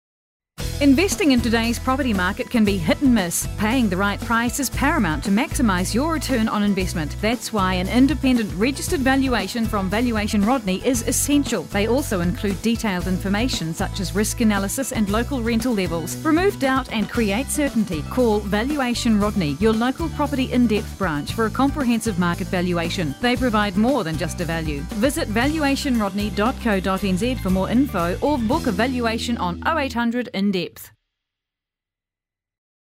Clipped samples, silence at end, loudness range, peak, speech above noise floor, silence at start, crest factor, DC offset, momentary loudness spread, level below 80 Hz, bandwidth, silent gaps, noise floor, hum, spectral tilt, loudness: under 0.1%; 2 s; 2 LU; -6 dBFS; 68 dB; 0.6 s; 16 dB; under 0.1%; 5 LU; -34 dBFS; 16 kHz; none; -88 dBFS; none; -5 dB/octave; -21 LUFS